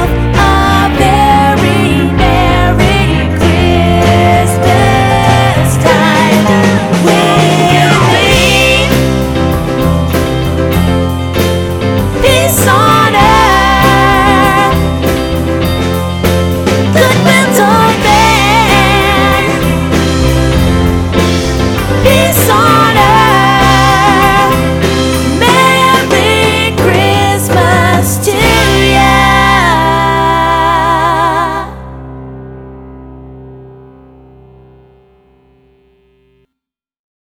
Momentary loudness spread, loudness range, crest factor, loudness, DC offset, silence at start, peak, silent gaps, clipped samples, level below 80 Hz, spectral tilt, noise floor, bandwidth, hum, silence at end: 6 LU; 3 LU; 8 dB; -8 LUFS; under 0.1%; 0 s; 0 dBFS; none; 0.9%; -20 dBFS; -5 dB/octave; -78 dBFS; 20 kHz; none; 3.5 s